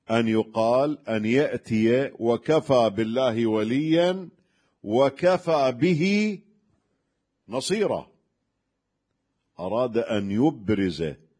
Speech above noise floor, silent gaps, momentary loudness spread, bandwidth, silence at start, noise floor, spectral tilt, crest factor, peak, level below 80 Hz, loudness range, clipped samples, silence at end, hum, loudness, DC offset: 56 dB; none; 8 LU; 10.5 kHz; 0.1 s; -78 dBFS; -6.5 dB/octave; 18 dB; -8 dBFS; -60 dBFS; 7 LU; under 0.1%; 0.25 s; none; -24 LUFS; under 0.1%